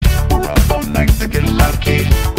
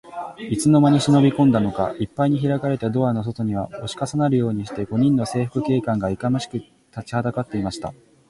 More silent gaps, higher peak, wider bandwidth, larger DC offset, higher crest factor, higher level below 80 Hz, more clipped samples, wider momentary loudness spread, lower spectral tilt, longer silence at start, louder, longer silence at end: neither; first, 0 dBFS vs -6 dBFS; first, 16.5 kHz vs 11.5 kHz; neither; about the same, 12 dB vs 16 dB; first, -16 dBFS vs -50 dBFS; neither; second, 2 LU vs 14 LU; second, -5.5 dB/octave vs -7 dB/octave; about the same, 0 s vs 0.05 s; first, -14 LUFS vs -21 LUFS; second, 0 s vs 0.35 s